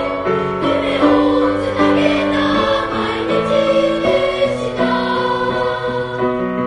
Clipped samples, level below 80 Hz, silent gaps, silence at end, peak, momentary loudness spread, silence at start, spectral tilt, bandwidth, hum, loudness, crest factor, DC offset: under 0.1%; -42 dBFS; none; 0 s; -2 dBFS; 5 LU; 0 s; -6 dB/octave; 10.5 kHz; none; -16 LUFS; 14 dB; under 0.1%